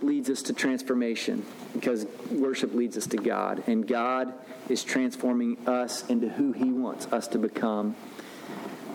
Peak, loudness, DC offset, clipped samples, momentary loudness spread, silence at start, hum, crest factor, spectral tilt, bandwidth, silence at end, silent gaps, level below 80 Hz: -14 dBFS; -29 LUFS; under 0.1%; under 0.1%; 10 LU; 0 s; none; 16 dB; -4 dB/octave; 17 kHz; 0 s; none; -80 dBFS